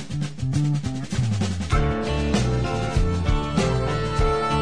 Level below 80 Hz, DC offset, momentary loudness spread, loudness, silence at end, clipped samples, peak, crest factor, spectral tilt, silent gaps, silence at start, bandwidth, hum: -28 dBFS; 1%; 3 LU; -24 LUFS; 0 s; under 0.1%; -8 dBFS; 14 dB; -6 dB/octave; none; 0 s; 10.5 kHz; none